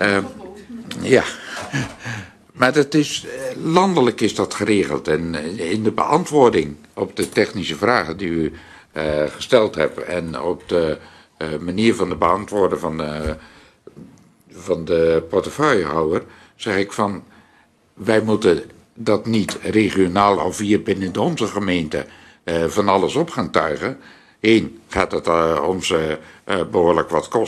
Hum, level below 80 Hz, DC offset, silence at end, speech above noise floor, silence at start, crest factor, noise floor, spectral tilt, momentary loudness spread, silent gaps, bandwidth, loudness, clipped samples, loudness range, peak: none; -48 dBFS; under 0.1%; 0 s; 37 dB; 0 s; 20 dB; -55 dBFS; -5 dB/octave; 11 LU; none; 13 kHz; -19 LUFS; under 0.1%; 3 LU; 0 dBFS